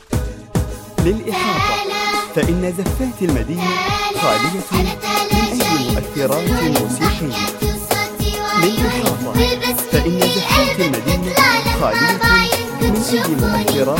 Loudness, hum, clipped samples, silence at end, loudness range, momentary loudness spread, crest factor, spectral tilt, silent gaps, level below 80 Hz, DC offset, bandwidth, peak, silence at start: -17 LUFS; none; under 0.1%; 0 s; 4 LU; 7 LU; 16 dB; -4.5 dB/octave; none; -28 dBFS; under 0.1%; 17 kHz; 0 dBFS; 0.1 s